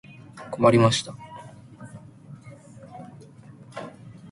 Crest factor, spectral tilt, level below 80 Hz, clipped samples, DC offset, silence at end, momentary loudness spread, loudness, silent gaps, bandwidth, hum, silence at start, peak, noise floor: 22 dB; -5.5 dB/octave; -60 dBFS; under 0.1%; under 0.1%; 0.05 s; 27 LU; -20 LUFS; none; 11.5 kHz; none; 0.35 s; -4 dBFS; -47 dBFS